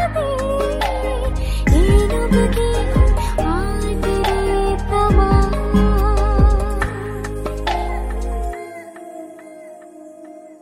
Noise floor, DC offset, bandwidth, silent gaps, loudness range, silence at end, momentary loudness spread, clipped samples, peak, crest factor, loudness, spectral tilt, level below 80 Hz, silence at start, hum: -39 dBFS; under 0.1%; 14 kHz; none; 9 LU; 0.05 s; 21 LU; under 0.1%; -2 dBFS; 16 dB; -18 LUFS; -6.5 dB/octave; -20 dBFS; 0 s; none